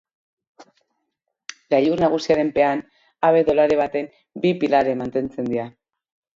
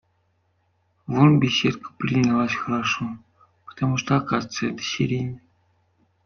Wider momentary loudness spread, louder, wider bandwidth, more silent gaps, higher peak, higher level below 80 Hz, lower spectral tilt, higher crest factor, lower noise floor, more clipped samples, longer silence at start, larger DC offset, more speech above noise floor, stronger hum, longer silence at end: about the same, 15 LU vs 14 LU; first, -20 LUFS vs -23 LUFS; about the same, 7.6 kHz vs 7 kHz; neither; about the same, -4 dBFS vs -4 dBFS; about the same, -56 dBFS vs -56 dBFS; about the same, -6.5 dB/octave vs -5.5 dB/octave; about the same, 18 dB vs 20 dB; first, -78 dBFS vs -68 dBFS; neither; first, 1.7 s vs 1.1 s; neither; first, 58 dB vs 46 dB; neither; second, 0.7 s vs 0.9 s